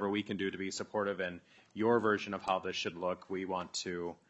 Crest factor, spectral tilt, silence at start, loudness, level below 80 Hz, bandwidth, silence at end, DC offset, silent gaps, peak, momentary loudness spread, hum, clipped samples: 20 dB; -4.5 dB/octave; 0 s; -35 LUFS; -76 dBFS; 8.2 kHz; 0.15 s; under 0.1%; none; -16 dBFS; 9 LU; none; under 0.1%